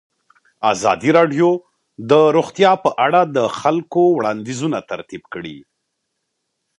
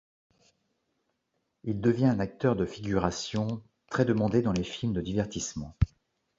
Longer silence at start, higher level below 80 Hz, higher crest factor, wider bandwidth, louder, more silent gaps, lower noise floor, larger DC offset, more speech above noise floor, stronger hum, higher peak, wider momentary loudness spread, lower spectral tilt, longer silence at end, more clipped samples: second, 0.6 s vs 1.65 s; second, -62 dBFS vs -44 dBFS; about the same, 18 dB vs 20 dB; first, 11 kHz vs 7.8 kHz; first, -16 LUFS vs -29 LUFS; neither; second, -74 dBFS vs -79 dBFS; neither; first, 58 dB vs 51 dB; neither; first, 0 dBFS vs -10 dBFS; first, 16 LU vs 9 LU; about the same, -5.5 dB/octave vs -6 dB/octave; first, 1.2 s vs 0.5 s; neither